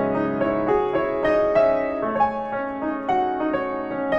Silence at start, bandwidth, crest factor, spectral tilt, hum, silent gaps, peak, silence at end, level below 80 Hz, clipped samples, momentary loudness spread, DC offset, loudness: 0 s; 7 kHz; 14 dB; -8 dB/octave; none; none; -8 dBFS; 0 s; -50 dBFS; under 0.1%; 8 LU; under 0.1%; -22 LUFS